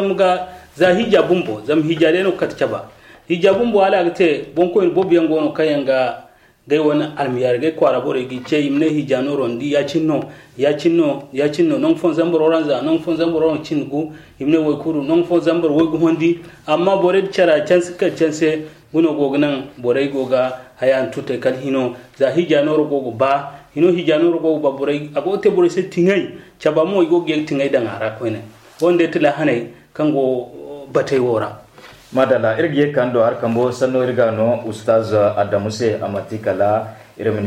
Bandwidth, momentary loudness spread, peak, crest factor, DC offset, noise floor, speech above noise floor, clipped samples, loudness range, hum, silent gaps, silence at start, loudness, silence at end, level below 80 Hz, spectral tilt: 11 kHz; 8 LU; -2 dBFS; 14 dB; under 0.1%; -42 dBFS; 26 dB; under 0.1%; 2 LU; none; none; 0 s; -17 LUFS; 0 s; -56 dBFS; -6.5 dB/octave